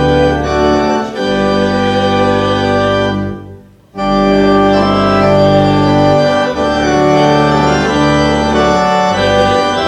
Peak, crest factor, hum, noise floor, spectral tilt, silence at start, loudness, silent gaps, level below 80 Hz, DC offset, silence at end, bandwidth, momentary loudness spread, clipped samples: 0 dBFS; 10 dB; none; -35 dBFS; -6 dB/octave; 0 s; -11 LUFS; none; -30 dBFS; under 0.1%; 0 s; 11.5 kHz; 5 LU; under 0.1%